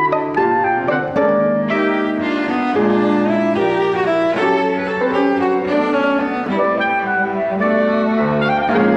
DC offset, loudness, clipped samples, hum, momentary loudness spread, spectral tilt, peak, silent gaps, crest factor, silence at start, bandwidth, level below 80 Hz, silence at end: under 0.1%; -17 LUFS; under 0.1%; none; 3 LU; -7.5 dB/octave; -2 dBFS; none; 14 dB; 0 s; 8.4 kHz; -52 dBFS; 0 s